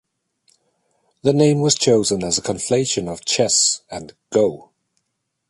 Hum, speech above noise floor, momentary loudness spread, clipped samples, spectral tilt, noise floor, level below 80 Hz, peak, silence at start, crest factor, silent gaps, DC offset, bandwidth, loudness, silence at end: none; 57 dB; 9 LU; under 0.1%; -3.5 dB/octave; -75 dBFS; -54 dBFS; 0 dBFS; 1.25 s; 20 dB; none; under 0.1%; 11.5 kHz; -18 LUFS; 0.9 s